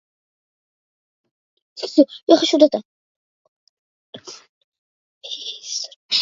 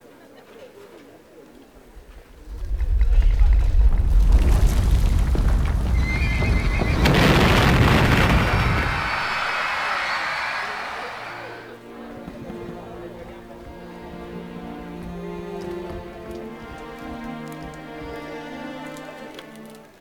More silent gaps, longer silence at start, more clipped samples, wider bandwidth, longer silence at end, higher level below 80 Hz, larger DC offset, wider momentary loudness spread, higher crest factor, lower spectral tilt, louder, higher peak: first, 2.23-2.27 s, 2.85-4.13 s, 4.49-4.72 s, 4.78-5.21 s, 5.96-6.09 s vs none; first, 1.75 s vs 0.6 s; neither; second, 7.6 kHz vs 16 kHz; second, 0 s vs 0.2 s; second, -74 dBFS vs -24 dBFS; neither; about the same, 23 LU vs 21 LU; about the same, 22 dB vs 18 dB; second, -2.5 dB/octave vs -6 dB/octave; first, -18 LUFS vs -21 LUFS; first, 0 dBFS vs -4 dBFS